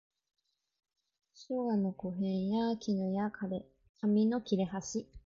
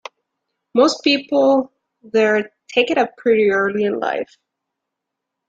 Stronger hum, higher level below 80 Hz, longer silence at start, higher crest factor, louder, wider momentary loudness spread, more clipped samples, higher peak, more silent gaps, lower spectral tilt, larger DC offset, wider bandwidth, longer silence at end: neither; about the same, -66 dBFS vs -64 dBFS; first, 1.4 s vs 0.75 s; about the same, 16 dB vs 18 dB; second, -34 LUFS vs -17 LUFS; first, 10 LU vs 7 LU; neither; second, -20 dBFS vs -2 dBFS; first, 3.89-3.94 s vs none; first, -6.5 dB/octave vs -4 dB/octave; neither; about the same, 7.6 kHz vs 7.8 kHz; second, 0.1 s vs 1.25 s